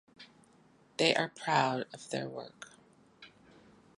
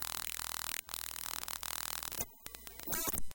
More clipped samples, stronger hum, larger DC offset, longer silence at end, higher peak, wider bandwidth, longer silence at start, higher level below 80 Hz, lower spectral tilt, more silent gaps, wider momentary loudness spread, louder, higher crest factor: neither; neither; neither; first, 0.7 s vs 0 s; first, -10 dBFS vs -16 dBFS; second, 11.5 kHz vs 17.5 kHz; first, 0.2 s vs 0 s; second, -78 dBFS vs -56 dBFS; first, -4 dB/octave vs -0.5 dB/octave; neither; first, 21 LU vs 7 LU; first, -32 LUFS vs -39 LUFS; about the same, 26 dB vs 24 dB